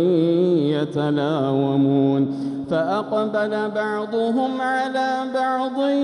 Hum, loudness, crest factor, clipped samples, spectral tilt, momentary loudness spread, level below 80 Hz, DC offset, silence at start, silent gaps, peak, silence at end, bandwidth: none; -21 LUFS; 12 dB; under 0.1%; -7.5 dB/octave; 5 LU; -66 dBFS; under 0.1%; 0 s; none; -8 dBFS; 0 s; 10.5 kHz